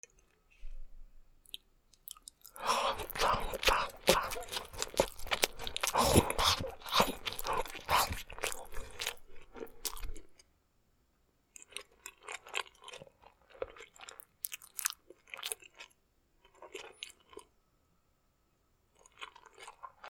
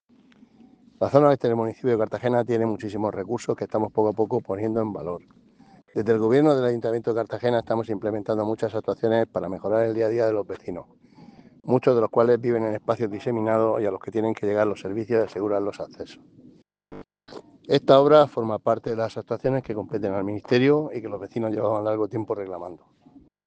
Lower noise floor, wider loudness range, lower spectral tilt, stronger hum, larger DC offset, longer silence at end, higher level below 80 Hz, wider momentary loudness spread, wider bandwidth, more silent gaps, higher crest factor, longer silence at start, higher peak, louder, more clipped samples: first, -74 dBFS vs -55 dBFS; first, 17 LU vs 4 LU; second, -2.5 dB/octave vs -7.5 dB/octave; neither; neither; second, 0 s vs 0.7 s; first, -50 dBFS vs -64 dBFS; first, 22 LU vs 13 LU; first, over 20 kHz vs 8.8 kHz; neither; first, 38 dB vs 22 dB; second, 0.6 s vs 1 s; about the same, 0 dBFS vs -2 dBFS; second, -34 LUFS vs -24 LUFS; neither